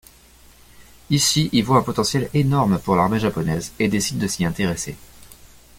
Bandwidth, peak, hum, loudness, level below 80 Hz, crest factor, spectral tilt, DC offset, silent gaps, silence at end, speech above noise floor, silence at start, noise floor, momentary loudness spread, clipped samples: 17 kHz; -2 dBFS; none; -20 LUFS; -46 dBFS; 18 dB; -4.5 dB/octave; under 0.1%; none; 0.3 s; 30 dB; 0.8 s; -49 dBFS; 7 LU; under 0.1%